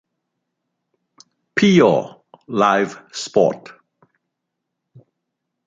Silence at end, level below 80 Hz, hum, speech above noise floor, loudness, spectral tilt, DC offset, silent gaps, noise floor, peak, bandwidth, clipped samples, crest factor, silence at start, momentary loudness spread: 2.1 s; -64 dBFS; none; 63 dB; -17 LUFS; -5.5 dB/octave; under 0.1%; none; -79 dBFS; -2 dBFS; 8.8 kHz; under 0.1%; 20 dB; 1.55 s; 16 LU